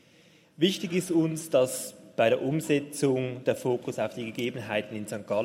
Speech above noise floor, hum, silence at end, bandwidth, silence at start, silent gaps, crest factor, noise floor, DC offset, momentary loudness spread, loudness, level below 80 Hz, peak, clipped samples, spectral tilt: 31 dB; none; 0 s; 16 kHz; 0.6 s; none; 18 dB; -59 dBFS; under 0.1%; 7 LU; -28 LUFS; -72 dBFS; -10 dBFS; under 0.1%; -5 dB/octave